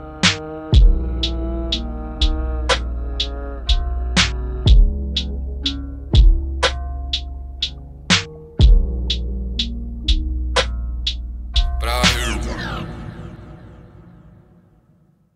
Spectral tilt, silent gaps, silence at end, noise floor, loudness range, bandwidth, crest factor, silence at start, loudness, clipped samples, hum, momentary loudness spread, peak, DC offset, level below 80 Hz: -4 dB/octave; none; 1.25 s; -56 dBFS; 4 LU; 12 kHz; 18 dB; 0 s; -20 LUFS; under 0.1%; none; 13 LU; 0 dBFS; under 0.1%; -20 dBFS